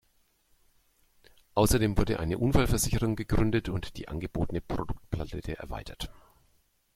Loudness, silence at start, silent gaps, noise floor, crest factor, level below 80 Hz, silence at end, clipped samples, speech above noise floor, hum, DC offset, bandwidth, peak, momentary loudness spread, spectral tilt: -30 LUFS; 1.55 s; none; -69 dBFS; 20 dB; -38 dBFS; 0.85 s; under 0.1%; 41 dB; none; under 0.1%; 16 kHz; -8 dBFS; 13 LU; -5.5 dB/octave